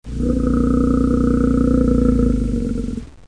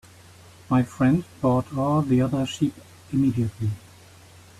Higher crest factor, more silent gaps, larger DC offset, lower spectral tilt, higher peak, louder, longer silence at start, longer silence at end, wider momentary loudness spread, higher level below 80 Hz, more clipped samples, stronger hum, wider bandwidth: about the same, 14 dB vs 14 dB; neither; first, 0.5% vs under 0.1%; first, -9 dB/octave vs -7.5 dB/octave; first, -4 dBFS vs -10 dBFS; first, -17 LUFS vs -24 LUFS; second, 0.05 s vs 0.7 s; second, 0.2 s vs 0.8 s; about the same, 7 LU vs 8 LU; first, -24 dBFS vs -52 dBFS; neither; neither; second, 10.5 kHz vs 13.5 kHz